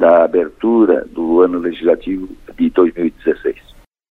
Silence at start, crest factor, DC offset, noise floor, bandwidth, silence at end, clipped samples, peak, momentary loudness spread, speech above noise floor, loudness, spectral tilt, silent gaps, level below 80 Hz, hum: 0 s; 14 dB; under 0.1%; -45 dBFS; 4.1 kHz; 0.6 s; under 0.1%; 0 dBFS; 12 LU; 32 dB; -15 LUFS; -8.5 dB/octave; none; -44 dBFS; none